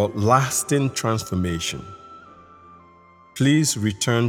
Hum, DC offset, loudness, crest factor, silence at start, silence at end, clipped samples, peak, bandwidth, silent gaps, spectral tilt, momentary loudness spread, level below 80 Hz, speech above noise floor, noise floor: none; under 0.1%; -21 LUFS; 20 dB; 0 s; 0 s; under 0.1%; -2 dBFS; 18 kHz; none; -4.5 dB/octave; 18 LU; -50 dBFS; 30 dB; -51 dBFS